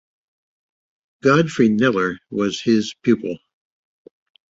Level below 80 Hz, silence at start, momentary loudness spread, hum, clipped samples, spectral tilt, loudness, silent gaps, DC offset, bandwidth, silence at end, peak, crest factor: -60 dBFS; 1.25 s; 7 LU; none; under 0.1%; -6 dB/octave; -19 LUFS; none; under 0.1%; 7.8 kHz; 1.15 s; -2 dBFS; 18 dB